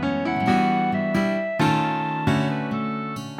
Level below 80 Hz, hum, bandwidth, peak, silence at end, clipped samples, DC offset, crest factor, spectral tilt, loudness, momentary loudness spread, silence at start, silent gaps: -52 dBFS; none; 15.5 kHz; -8 dBFS; 0 s; under 0.1%; under 0.1%; 16 dB; -6.5 dB/octave; -23 LUFS; 6 LU; 0 s; none